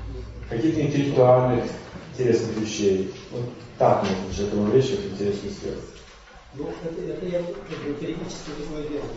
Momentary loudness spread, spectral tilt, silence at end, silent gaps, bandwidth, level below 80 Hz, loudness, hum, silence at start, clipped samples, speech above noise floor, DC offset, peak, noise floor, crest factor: 15 LU; -6.5 dB/octave; 0 s; none; 8 kHz; -44 dBFS; -24 LUFS; none; 0 s; under 0.1%; 23 dB; under 0.1%; -6 dBFS; -46 dBFS; 20 dB